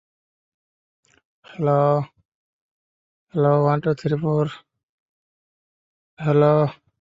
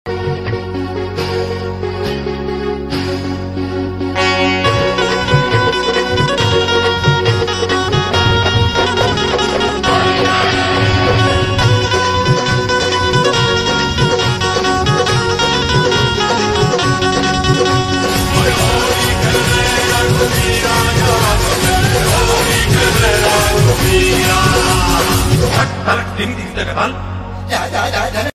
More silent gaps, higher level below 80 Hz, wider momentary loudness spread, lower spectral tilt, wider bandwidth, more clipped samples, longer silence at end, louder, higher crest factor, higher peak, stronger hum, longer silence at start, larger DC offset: first, 2.25-3.27 s, 4.83-6.17 s vs none; second, -62 dBFS vs -26 dBFS; first, 11 LU vs 8 LU; first, -9.5 dB/octave vs -4 dB/octave; second, 7.6 kHz vs 15.5 kHz; neither; first, 0.3 s vs 0.05 s; second, -20 LUFS vs -13 LUFS; first, 20 dB vs 12 dB; second, -4 dBFS vs 0 dBFS; neither; first, 1.5 s vs 0.05 s; neither